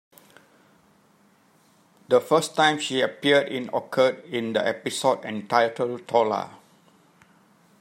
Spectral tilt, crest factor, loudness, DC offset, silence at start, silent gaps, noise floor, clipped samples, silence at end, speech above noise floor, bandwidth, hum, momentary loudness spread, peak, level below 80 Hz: -4 dB/octave; 20 dB; -23 LUFS; under 0.1%; 2.1 s; none; -60 dBFS; under 0.1%; 1.3 s; 37 dB; 16 kHz; none; 9 LU; -4 dBFS; -76 dBFS